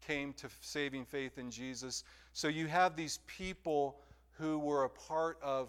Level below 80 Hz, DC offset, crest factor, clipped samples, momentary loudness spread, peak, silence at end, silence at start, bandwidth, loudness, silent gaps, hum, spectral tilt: -64 dBFS; under 0.1%; 20 dB; under 0.1%; 11 LU; -20 dBFS; 0 s; 0 s; 16.5 kHz; -38 LUFS; none; none; -4 dB/octave